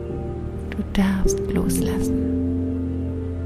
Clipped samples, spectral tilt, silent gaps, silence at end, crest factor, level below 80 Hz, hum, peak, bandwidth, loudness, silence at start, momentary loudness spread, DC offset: under 0.1%; -6.5 dB/octave; none; 0 s; 16 dB; -30 dBFS; none; -8 dBFS; 15.5 kHz; -24 LUFS; 0 s; 8 LU; under 0.1%